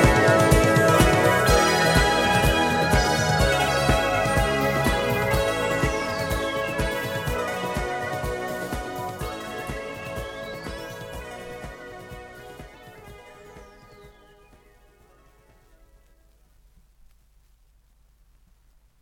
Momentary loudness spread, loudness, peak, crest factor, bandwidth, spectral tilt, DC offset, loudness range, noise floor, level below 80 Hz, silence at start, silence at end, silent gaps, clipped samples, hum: 20 LU; -22 LUFS; -4 dBFS; 20 dB; 17.5 kHz; -4.5 dB/octave; under 0.1%; 21 LU; -59 dBFS; -34 dBFS; 0 s; 4.95 s; none; under 0.1%; none